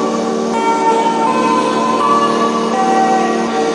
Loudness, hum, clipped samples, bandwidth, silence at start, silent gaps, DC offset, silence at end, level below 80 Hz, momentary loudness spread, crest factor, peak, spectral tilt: -14 LUFS; none; under 0.1%; 11 kHz; 0 s; none; under 0.1%; 0 s; -56 dBFS; 3 LU; 12 dB; 0 dBFS; -4.5 dB/octave